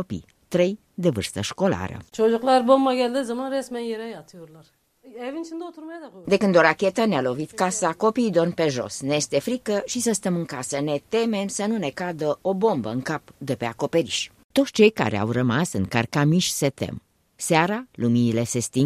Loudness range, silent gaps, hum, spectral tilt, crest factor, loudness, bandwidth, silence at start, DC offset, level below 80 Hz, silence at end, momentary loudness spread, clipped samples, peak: 4 LU; 14.44-14.50 s; none; -5 dB/octave; 20 dB; -23 LUFS; 15 kHz; 0 s; under 0.1%; -60 dBFS; 0 s; 14 LU; under 0.1%; -2 dBFS